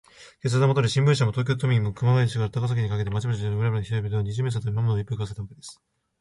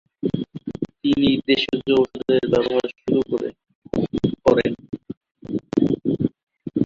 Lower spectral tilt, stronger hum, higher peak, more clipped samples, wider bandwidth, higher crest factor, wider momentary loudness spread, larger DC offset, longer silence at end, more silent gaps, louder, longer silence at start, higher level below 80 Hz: about the same, -6.5 dB/octave vs -7 dB/octave; neither; second, -8 dBFS vs -2 dBFS; neither; first, 11.5 kHz vs 7.4 kHz; about the same, 16 dB vs 20 dB; about the same, 11 LU vs 13 LU; neither; first, 0.45 s vs 0 s; second, none vs 3.75-3.82 s, 5.17-5.21 s, 5.31-5.35 s, 6.43-6.47 s; second, -25 LUFS vs -22 LUFS; about the same, 0.2 s vs 0.25 s; about the same, -50 dBFS vs -50 dBFS